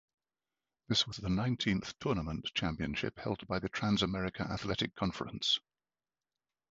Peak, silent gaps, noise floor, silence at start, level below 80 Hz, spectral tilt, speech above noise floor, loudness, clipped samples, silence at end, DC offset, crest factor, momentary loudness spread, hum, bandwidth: -16 dBFS; none; under -90 dBFS; 0.9 s; -54 dBFS; -5 dB/octave; over 55 dB; -35 LUFS; under 0.1%; 1.15 s; under 0.1%; 20 dB; 6 LU; none; 7.8 kHz